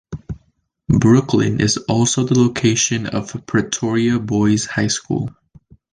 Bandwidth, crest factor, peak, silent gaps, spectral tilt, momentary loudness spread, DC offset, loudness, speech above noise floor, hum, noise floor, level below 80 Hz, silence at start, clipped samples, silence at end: 10.5 kHz; 16 dB; -2 dBFS; none; -5 dB/octave; 11 LU; under 0.1%; -17 LUFS; 46 dB; none; -63 dBFS; -42 dBFS; 0.1 s; under 0.1%; 0.65 s